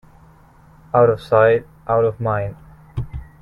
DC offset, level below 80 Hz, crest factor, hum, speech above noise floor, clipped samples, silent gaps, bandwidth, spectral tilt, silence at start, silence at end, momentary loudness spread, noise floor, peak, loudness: under 0.1%; -42 dBFS; 18 dB; none; 32 dB; under 0.1%; none; 11 kHz; -8.5 dB/octave; 0.95 s; 0.2 s; 16 LU; -48 dBFS; 0 dBFS; -17 LUFS